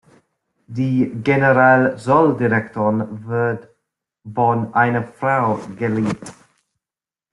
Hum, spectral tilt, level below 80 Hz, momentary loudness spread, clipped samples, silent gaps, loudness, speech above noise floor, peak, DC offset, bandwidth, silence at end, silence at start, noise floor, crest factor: none; -8 dB/octave; -58 dBFS; 11 LU; under 0.1%; none; -18 LUFS; over 73 dB; -2 dBFS; under 0.1%; 11.5 kHz; 1 s; 0.7 s; under -90 dBFS; 18 dB